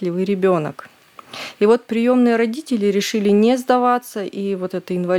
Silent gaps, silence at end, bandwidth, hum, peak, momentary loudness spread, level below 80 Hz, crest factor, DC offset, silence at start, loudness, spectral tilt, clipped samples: none; 0 s; 16 kHz; none; -2 dBFS; 11 LU; -70 dBFS; 16 dB; under 0.1%; 0 s; -18 LUFS; -6 dB/octave; under 0.1%